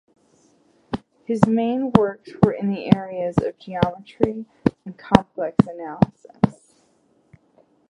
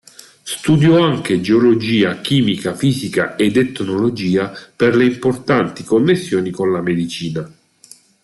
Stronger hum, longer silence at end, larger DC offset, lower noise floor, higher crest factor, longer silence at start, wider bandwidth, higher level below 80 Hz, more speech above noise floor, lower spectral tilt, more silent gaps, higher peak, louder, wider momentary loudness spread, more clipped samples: neither; first, 1.4 s vs 0.75 s; neither; first, -62 dBFS vs -46 dBFS; first, 22 dB vs 14 dB; first, 0.9 s vs 0.45 s; second, 10.5 kHz vs 12.5 kHz; first, -46 dBFS vs -54 dBFS; first, 41 dB vs 31 dB; first, -8.5 dB/octave vs -6 dB/octave; neither; about the same, 0 dBFS vs -2 dBFS; second, -22 LUFS vs -16 LUFS; about the same, 10 LU vs 9 LU; neither